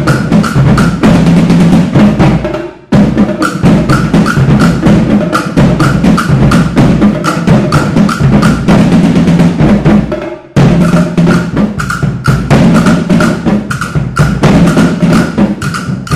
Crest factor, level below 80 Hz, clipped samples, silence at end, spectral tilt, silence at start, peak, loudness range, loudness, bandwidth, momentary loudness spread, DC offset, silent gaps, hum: 6 dB; -24 dBFS; 1%; 0 s; -7 dB/octave; 0 s; 0 dBFS; 2 LU; -8 LUFS; 13.5 kHz; 6 LU; 0.7%; none; none